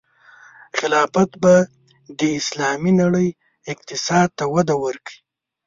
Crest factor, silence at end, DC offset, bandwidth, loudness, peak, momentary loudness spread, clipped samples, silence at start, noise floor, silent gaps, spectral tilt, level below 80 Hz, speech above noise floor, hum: 18 dB; 0.5 s; under 0.1%; 7.6 kHz; -19 LUFS; -2 dBFS; 17 LU; under 0.1%; 0.75 s; -48 dBFS; none; -5 dB/octave; -56 dBFS; 30 dB; none